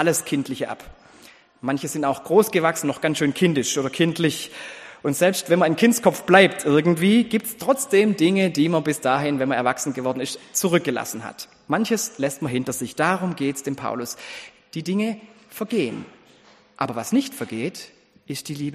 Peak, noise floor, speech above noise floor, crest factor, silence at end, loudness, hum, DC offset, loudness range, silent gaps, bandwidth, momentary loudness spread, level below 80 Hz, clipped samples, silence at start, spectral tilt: 0 dBFS; -53 dBFS; 32 dB; 22 dB; 0 s; -22 LUFS; none; under 0.1%; 9 LU; none; 15.5 kHz; 15 LU; -62 dBFS; under 0.1%; 0 s; -4.5 dB/octave